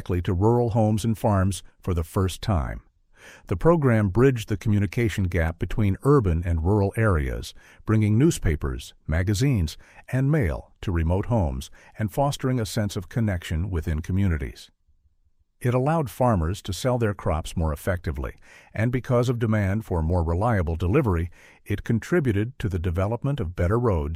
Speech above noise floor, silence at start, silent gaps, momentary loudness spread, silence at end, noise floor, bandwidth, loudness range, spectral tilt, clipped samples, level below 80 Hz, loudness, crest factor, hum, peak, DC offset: 40 dB; 0 s; none; 10 LU; 0 s; -64 dBFS; 15.5 kHz; 4 LU; -7 dB/octave; under 0.1%; -36 dBFS; -24 LUFS; 18 dB; none; -6 dBFS; under 0.1%